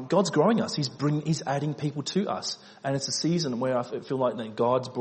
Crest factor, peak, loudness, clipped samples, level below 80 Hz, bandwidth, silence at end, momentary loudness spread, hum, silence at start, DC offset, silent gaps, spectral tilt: 16 dB; -10 dBFS; -27 LUFS; under 0.1%; -68 dBFS; 8.8 kHz; 0 s; 8 LU; none; 0 s; under 0.1%; none; -5.5 dB/octave